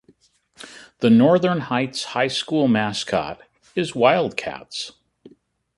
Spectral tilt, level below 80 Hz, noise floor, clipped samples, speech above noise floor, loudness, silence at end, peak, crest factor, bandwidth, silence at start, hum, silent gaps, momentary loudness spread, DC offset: -5.5 dB/octave; -60 dBFS; -58 dBFS; under 0.1%; 39 dB; -20 LUFS; 0.5 s; -2 dBFS; 20 dB; 11.5 kHz; 0.6 s; none; none; 18 LU; under 0.1%